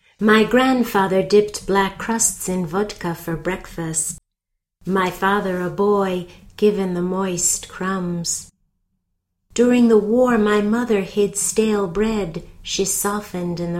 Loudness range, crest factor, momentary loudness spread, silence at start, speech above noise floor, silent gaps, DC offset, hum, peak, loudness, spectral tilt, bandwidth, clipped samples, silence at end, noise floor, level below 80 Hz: 5 LU; 18 dB; 11 LU; 0.2 s; 60 dB; none; under 0.1%; none; -2 dBFS; -19 LUFS; -4 dB/octave; 16.5 kHz; under 0.1%; 0 s; -79 dBFS; -46 dBFS